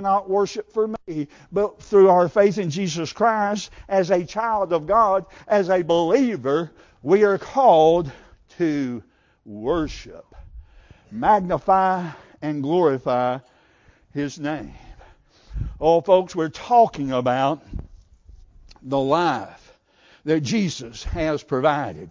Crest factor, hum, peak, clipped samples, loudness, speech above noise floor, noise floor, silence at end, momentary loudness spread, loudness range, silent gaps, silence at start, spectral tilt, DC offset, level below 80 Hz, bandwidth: 18 dB; none; -4 dBFS; under 0.1%; -21 LUFS; 36 dB; -56 dBFS; 0 s; 16 LU; 6 LU; none; 0 s; -6 dB/octave; under 0.1%; -44 dBFS; 7.6 kHz